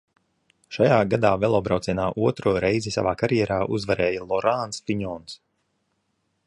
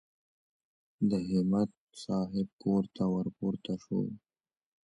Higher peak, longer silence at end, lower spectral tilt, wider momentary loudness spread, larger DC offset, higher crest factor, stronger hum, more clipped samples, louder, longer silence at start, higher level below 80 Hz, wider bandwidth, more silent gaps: first, -4 dBFS vs -18 dBFS; first, 1.1 s vs 0.7 s; second, -6 dB/octave vs -8.5 dB/octave; about the same, 10 LU vs 8 LU; neither; about the same, 20 dB vs 16 dB; neither; neither; first, -23 LUFS vs -33 LUFS; second, 0.7 s vs 1 s; first, -50 dBFS vs -64 dBFS; about the same, 11.5 kHz vs 11 kHz; second, none vs 1.77-1.87 s, 2.53-2.59 s